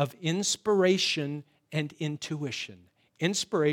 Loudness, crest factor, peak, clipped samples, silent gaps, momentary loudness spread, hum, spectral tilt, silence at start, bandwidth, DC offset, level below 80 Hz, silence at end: -29 LUFS; 18 dB; -12 dBFS; under 0.1%; none; 12 LU; none; -4 dB/octave; 0 s; 16.5 kHz; under 0.1%; -76 dBFS; 0 s